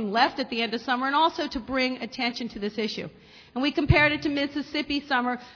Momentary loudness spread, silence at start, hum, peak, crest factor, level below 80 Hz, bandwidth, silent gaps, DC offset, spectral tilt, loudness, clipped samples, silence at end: 11 LU; 0 s; none; -6 dBFS; 20 dB; -44 dBFS; 5.4 kHz; none; under 0.1%; -6 dB/octave; -26 LUFS; under 0.1%; 0 s